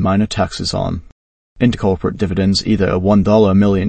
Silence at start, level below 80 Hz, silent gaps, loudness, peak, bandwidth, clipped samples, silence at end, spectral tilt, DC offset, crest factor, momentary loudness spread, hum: 0 s; -34 dBFS; 1.12-1.56 s; -15 LUFS; 0 dBFS; 8.8 kHz; under 0.1%; 0 s; -6.5 dB/octave; under 0.1%; 14 dB; 8 LU; none